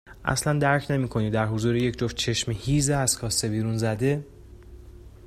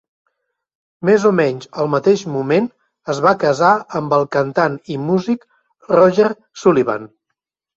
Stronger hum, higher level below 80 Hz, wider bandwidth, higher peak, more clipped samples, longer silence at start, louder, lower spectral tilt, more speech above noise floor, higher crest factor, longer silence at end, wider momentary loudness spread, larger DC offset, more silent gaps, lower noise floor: neither; first, -44 dBFS vs -60 dBFS; first, 15 kHz vs 7.8 kHz; second, -6 dBFS vs -2 dBFS; neither; second, 0.05 s vs 1 s; second, -25 LUFS vs -16 LUFS; second, -4.5 dB/octave vs -6.5 dB/octave; second, 21 dB vs 62 dB; about the same, 20 dB vs 16 dB; second, 0 s vs 0.7 s; second, 4 LU vs 10 LU; neither; neither; second, -45 dBFS vs -77 dBFS